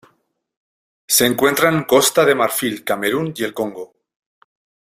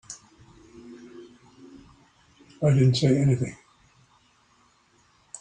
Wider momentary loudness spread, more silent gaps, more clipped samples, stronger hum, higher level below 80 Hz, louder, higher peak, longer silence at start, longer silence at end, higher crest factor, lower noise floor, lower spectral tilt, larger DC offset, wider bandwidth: second, 12 LU vs 27 LU; neither; neither; neither; about the same, -58 dBFS vs -58 dBFS; first, -16 LUFS vs -23 LUFS; first, -2 dBFS vs -8 dBFS; first, 1.1 s vs 0.1 s; first, 1.1 s vs 0.05 s; about the same, 18 dB vs 20 dB; about the same, -63 dBFS vs -62 dBFS; second, -3 dB/octave vs -7 dB/octave; neither; first, 16 kHz vs 9.6 kHz